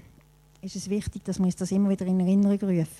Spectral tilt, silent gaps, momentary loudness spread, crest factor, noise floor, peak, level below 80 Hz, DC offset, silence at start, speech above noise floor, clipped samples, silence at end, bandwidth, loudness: -7.5 dB/octave; none; 13 LU; 12 dB; -57 dBFS; -14 dBFS; -52 dBFS; under 0.1%; 0.65 s; 32 dB; under 0.1%; 0 s; 12.5 kHz; -26 LUFS